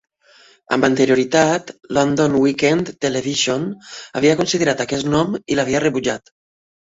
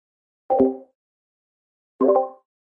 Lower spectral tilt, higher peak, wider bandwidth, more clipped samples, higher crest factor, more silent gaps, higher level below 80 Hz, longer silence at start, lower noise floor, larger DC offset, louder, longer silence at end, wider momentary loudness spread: second, -4.5 dB/octave vs -11 dB/octave; first, 0 dBFS vs -6 dBFS; first, 8 kHz vs 3 kHz; neither; about the same, 18 dB vs 18 dB; second, none vs 0.95-1.99 s; first, -52 dBFS vs -62 dBFS; first, 0.7 s vs 0.5 s; second, -51 dBFS vs under -90 dBFS; neither; first, -18 LUFS vs -21 LUFS; first, 0.7 s vs 0.45 s; second, 8 LU vs 12 LU